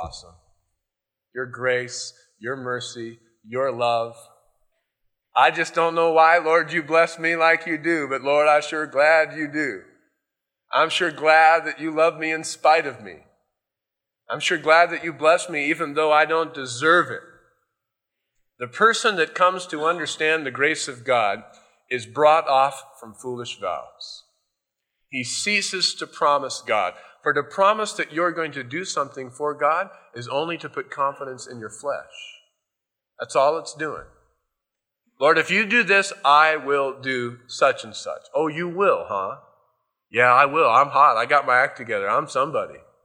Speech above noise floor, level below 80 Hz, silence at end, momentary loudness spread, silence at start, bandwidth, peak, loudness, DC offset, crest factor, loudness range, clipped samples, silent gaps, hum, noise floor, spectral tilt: 64 dB; -66 dBFS; 0.25 s; 17 LU; 0 s; 12 kHz; -2 dBFS; -20 LUFS; under 0.1%; 20 dB; 9 LU; under 0.1%; none; none; -86 dBFS; -3 dB/octave